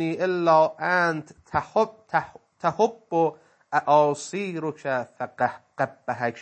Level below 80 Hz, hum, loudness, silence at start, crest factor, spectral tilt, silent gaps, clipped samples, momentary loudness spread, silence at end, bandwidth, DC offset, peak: -64 dBFS; none; -25 LUFS; 0 s; 18 dB; -5.5 dB/octave; none; under 0.1%; 10 LU; 0 s; 8.8 kHz; under 0.1%; -6 dBFS